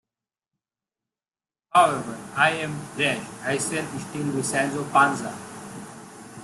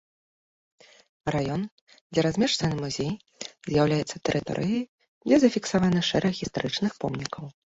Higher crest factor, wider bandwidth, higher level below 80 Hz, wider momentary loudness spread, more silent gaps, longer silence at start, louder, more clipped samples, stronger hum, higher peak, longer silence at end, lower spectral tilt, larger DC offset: about the same, 22 dB vs 20 dB; first, 12.5 kHz vs 8 kHz; second, -66 dBFS vs -56 dBFS; first, 19 LU vs 13 LU; second, none vs 1.71-1.87 s, 2.01-2.10 s, 4.89-4.98 s, 5.08-5.21 s; first, 1.75 s vs 1.25 s; about the same, -24 LUFS vs -26 LUFS; neither; neither; first, -4 dBFS vs -8 dBFS; second, 0 s vs 0.25 s; second, -4 dB/octave vs -5.5 dB/octave; neither